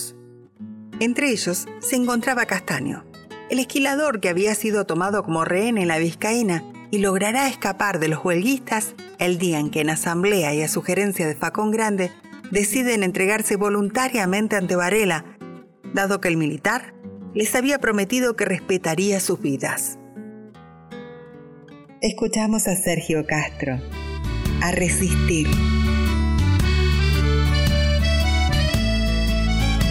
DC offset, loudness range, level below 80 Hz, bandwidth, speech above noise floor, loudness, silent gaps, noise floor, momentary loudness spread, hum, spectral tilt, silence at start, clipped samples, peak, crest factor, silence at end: under 0.1%; 4 LU; -28 dBFS; 17.5 kHz; 25 dB; -21 LUFS; none; -46 dBFS; 10 LU; none; -4.5 dB/octave; 0 s; under 0.1%; -4 dBFS; 16 dB; 0 s